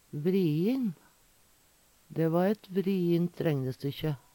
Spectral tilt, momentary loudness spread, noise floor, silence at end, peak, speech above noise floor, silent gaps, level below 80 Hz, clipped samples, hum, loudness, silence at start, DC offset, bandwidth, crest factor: -8.5 dB/octave; 8 LU; -64 dBFS; 0.15 s; -14 dBFS; 35 dB; none; -66 dBFS; under 0.1%; none; -30 LUFS; 0.15 s; under 0.1%; 18 kHz; 16 dB